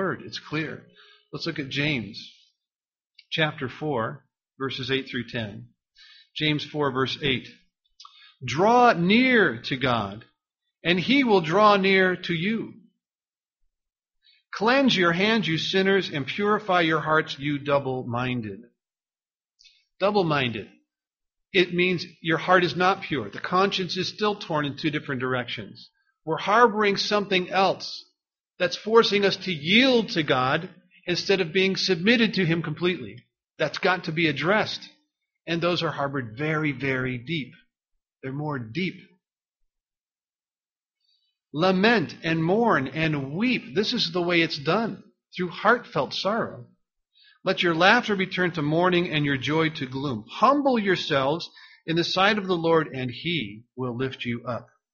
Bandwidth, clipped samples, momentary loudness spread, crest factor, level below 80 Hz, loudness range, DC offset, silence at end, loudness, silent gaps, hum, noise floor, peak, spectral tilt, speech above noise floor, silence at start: 7.2 kHz; under 0.1%; 13 LU; 22 dB; -62 dBFS; 8 LU; under 0.1%; 0.3 s; -24 LUFS; 3.06-3.10 s, 13.15-13.19 s; none; under -90 dBFS; -2 dBFS; -3 dB/octave; over 66 dB; 0 s